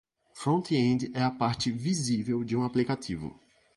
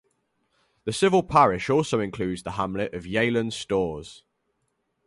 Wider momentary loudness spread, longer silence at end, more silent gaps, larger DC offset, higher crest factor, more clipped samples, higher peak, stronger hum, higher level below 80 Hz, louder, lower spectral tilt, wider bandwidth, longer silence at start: second, 8 LU vs 12 LU; second, 0.45 s vs 0.9 s; neither; neither; about the same, 16 dB vs 20 dB; neither; second, -14 dBFS vs -6 dBFS; neither; second, -60 dBFS vs -52 dBFS; second, -29 LUFS vs -24 LUFS; about the same, -5.5 dB/octave vs -5.5 dB/octave; about the same, 11.5 kHz vs 11.5 kHz; second, 0.35 s vs 0.85 s